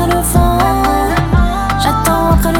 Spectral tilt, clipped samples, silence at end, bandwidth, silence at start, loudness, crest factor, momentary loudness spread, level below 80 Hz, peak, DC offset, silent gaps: -5.5 dB/octave; under 0.1%; 0 s; 18.5 kHz; 0 s; -12 LUFS; 12 dB; 2 LU; -18 dBFS; 0 dBFS; under 0.1%; none